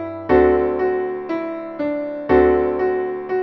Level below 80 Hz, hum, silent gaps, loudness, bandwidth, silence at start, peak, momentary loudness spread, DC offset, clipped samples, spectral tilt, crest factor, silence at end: -40 dBFS; none; none; -19 LUFS; 5.2 kHz; 0 s; -4 dBFS; 10 LU; under 0.1%; under 0.1%; -9.5 dB/octave; 16 dB; 0 s